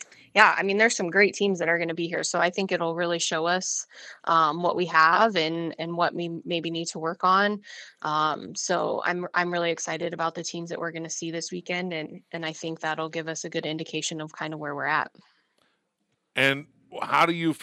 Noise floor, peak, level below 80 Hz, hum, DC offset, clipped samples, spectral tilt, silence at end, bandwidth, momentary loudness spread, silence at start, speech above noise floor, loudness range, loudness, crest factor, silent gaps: -76 dBFS; 0 dBFS; -80 dBFS; none; under 0.1%; under 0.1%; -3 dB/octave; 0 s; 13 kHz; 12 LU; 0 s; 50 dB; 8 LU; -25 LUFS; 26 dB; none